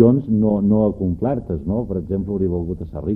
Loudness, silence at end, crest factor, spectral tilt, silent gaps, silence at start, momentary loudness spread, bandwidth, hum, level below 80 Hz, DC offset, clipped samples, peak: -20 LUFS; 0 s; 18 dB; -13 dB/octave; none; 0 s; 8 LU; 2.6 kHz; none; -38 dBFS; under 0.1%; under 0.1%; 0 dBFS